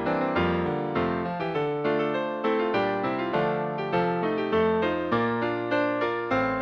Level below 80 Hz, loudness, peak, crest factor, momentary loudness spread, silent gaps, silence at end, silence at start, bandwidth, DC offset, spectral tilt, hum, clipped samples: -54 dBFS; -26 LUFS; -12 dBFS; 14 dB; 3 LU; none; 0 s; 0 s; 6.6 kHz; under 0.1%; -8 dB/octave; none; under 0.1%